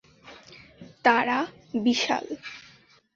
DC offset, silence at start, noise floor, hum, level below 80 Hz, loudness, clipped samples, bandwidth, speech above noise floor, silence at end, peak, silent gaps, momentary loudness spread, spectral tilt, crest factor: under 0.1%; 0.25 s; -56 dBFS; none; -68 dBFS; -25 LUFS; under 0.1%; 7.6 kHz; 32 dB; 0.55 s; -6 dBFS; none; 23 LU; -3.5 dB/octave; 22 dB